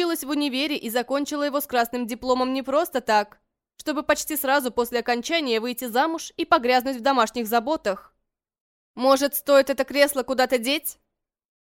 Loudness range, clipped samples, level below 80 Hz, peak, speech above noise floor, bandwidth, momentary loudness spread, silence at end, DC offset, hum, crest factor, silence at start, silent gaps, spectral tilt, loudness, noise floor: 2 LU; under 0.1%; -60 dBFS; -4 dBFS; 54 dB; 17 kHz; 7 LU; 0.8 s; under 0.1%; none; 20 dB; 0 s; 8.60-8.94 s; -2.5 dB/octave; -23 LUFS; -77 dBFS